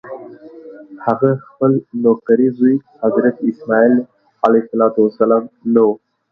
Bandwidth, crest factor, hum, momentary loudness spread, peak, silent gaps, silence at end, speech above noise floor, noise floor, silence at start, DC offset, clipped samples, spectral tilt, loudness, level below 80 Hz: 4.9 kHz; 16 dB; none; 8 LU; 0 dBFS; none; 0.35 s; 22 dB; -36 dBFS; 0.05 s; under 0.1%; under 0.1%; -10.5 dB/octave; -15 LUFS; -62 dBFS